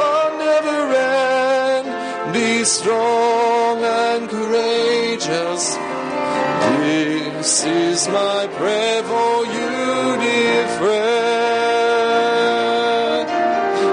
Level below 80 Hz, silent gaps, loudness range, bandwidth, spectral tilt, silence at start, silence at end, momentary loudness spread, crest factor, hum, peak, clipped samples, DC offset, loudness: -64 dBFS; none; 2 LU; 10 kHz; -2.5 dB/octave; 0 s; 0 s; 4 LU; 14 dB; none; -4 dBFS; under 0.1%; under 0.1%; -17 LUFS